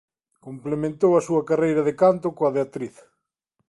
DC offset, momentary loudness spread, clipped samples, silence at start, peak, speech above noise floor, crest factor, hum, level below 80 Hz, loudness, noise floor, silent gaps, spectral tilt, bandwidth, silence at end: under 0.1%; 16 LU; under 0.1%; 0.45 s; -6 dBFS; 54 dB; 16 dB; none; -60 dBFS; -22 LUFS; -76 dBFS; none; -7.5 dB/octave; 11.5 kHz; 0.8 s